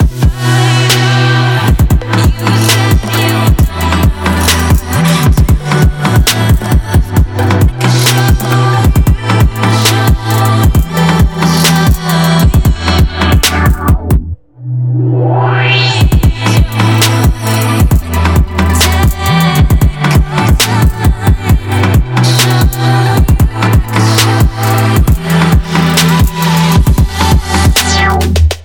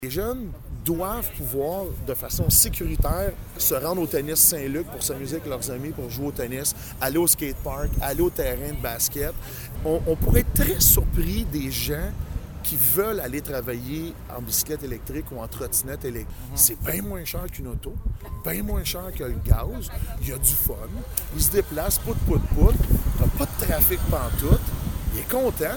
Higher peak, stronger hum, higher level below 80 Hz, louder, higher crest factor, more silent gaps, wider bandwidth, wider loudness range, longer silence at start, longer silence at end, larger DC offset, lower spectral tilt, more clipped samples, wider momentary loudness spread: about the same, 0 dBFS vs -2 dBFS; neither; first, -14 dBFS vs -28 dBFS; first, -9 LUFS vs -24 LUFS; second, 8 dB vs 22 dB; neither; about the same, 19.5 kHz vs 19 kHz; second, 1 LU vs 5 LU; about the same, 0 s vs 0 s; about the same, 0 s vs 0 s; neither; about the same, -5 dB/octave vs -4 dB/octave; neither; second, 3 LU vs 14 LU